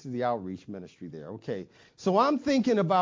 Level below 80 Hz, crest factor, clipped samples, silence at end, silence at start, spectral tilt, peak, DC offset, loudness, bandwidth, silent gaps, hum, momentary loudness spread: -66 dBFS; 18 dB; under 0.1%; 0 s; 0.05 s; -6.5 dB/octave; -10 dBFS; under 0.1%; -28 LUFS; 7.6 kHz; none; none; 18 LU